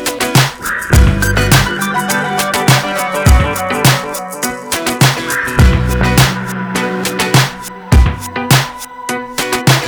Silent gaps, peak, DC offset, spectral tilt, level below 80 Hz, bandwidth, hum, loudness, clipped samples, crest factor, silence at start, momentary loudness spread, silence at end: none; 0 dBFS; under 0.1%; -4 dB/octave; -18 dBFS; over 20 kHz; none; -13 LUFS; under 0.1%; 12 dB; 0 s; 9 LU; 0 s